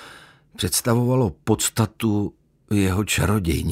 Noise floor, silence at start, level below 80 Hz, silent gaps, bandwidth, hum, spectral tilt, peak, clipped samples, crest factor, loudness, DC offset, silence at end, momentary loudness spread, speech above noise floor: -47 dBFS; 0 s; -40 dBFS; none; 16 kHz; none; -5 dB/octave; -6 dBFS; under 0.1%; 16 dB; -22 LUFS; under 0.1%; 0 s; 6 LU; 26 dB